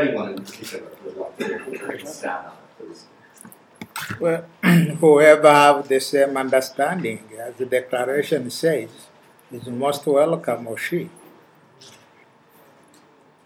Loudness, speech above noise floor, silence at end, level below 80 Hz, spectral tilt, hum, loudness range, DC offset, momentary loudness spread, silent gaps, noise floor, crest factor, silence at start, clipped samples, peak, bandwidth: -19 LUFS; 34 dB; 2.35 s; -72 dBFS; -5.5 dB/octave; none; 16 LU; under 0.1%; 22 LU; none; -53 dBFS; 22 dB; 0 s; under 0.1%; 0 dBFS; 17.5 kHz